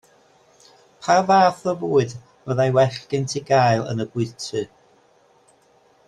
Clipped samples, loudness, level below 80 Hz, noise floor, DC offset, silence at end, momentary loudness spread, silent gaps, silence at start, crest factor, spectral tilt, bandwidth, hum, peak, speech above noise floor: under 0.1%; -20 LUFS; -60 dBFS; -57 dBFS; under 0.1%; 1.4 s; 13 LU; none; 1 s; 20 dB; -5.5 dB/octave; 11.5 kHz; none; -2 dBFS; 38 dB